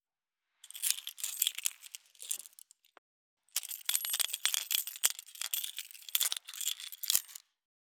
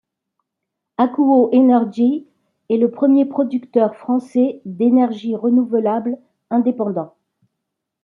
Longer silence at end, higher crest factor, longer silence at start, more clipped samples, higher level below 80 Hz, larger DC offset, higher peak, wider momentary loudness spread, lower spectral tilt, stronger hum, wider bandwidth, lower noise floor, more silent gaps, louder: second, 0.5 s vs 0.95 s; first, 36 dB vs 16 dB; second, 0.75 s vs 1 s; neither; second, under -90 dBFS vs -72 dBFS; neither; about the same, -2 dBFS vs -2 dBFS; first, 16 LU vs 10 LU; second, 5.5 dB/octave vs -9 dB/octave; neither; first, over 20 kHz vs 4.3 kHz; first, under -90 dBFS vs -80 dBFS; first, 2.98-3.37 s vs none; second, -33 LUFS vs -17 LUFS